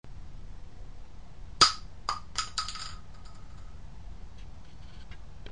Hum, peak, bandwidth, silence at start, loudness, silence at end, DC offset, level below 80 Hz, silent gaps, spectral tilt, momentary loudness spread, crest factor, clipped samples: none; -4 dBFS; 11.5 kHz; 0 s; -28 LUFS; 0 s; 0.8%; -46 dBFS; none; -1 dB/octave; 28 LU; 32 dB; under 0.1%